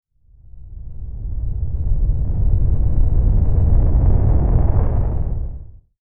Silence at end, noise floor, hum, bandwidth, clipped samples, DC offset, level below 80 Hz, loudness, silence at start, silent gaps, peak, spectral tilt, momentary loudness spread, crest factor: 0 s; -46 dBFS; none; 2.1 kHz; under 0.1%; under 0.1%; -18 dBFS; -20 LUFS; 0.05 s; none; -2 dBFS; -13.5 dB/octave; 15 LU; 14 dB